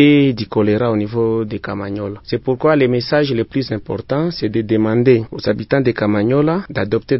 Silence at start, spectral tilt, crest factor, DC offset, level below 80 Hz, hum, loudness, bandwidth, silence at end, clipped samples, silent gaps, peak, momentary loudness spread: 0 s; -10.5 dB/octave; 16 dB; under 0.1%; -46 dBFS; none; -17 LUFS; 5.8 kHz; 0 s; under 0.1%; none; 0 dBFS; 9 LU